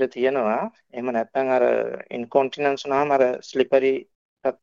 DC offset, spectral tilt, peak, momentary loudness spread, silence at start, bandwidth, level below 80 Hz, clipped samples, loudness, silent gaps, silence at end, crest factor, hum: under 0.1%; -5.5 dB/octave; -4 dBFS; 10 LU; 0 s; 7.4 kHz; -68 dBFS; under 0.1%; -23 LUFS; 4.15-4.37 s; 0.1 s; 18 dB; none